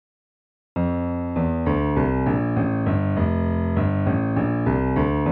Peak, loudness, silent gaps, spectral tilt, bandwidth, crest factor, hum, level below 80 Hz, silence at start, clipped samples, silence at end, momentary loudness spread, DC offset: -8 dBFS; -22 LUFS; none; -9 dB/octave; 4.4 kHz; 14 dB; none; -34 dBFS; 0.75 s; under 0.1%; 0 s; 3 LU; under 0.1%